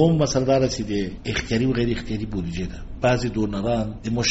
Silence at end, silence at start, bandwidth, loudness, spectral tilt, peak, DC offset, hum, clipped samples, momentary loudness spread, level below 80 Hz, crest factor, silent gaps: 0 s; 0 s; 8 kHz; -23 LUFS; -5.5 dB/octave; -6 dBFS; under 0.1%; none; under 0.1%; 9 LU; -36 dBFS; 16 dB; none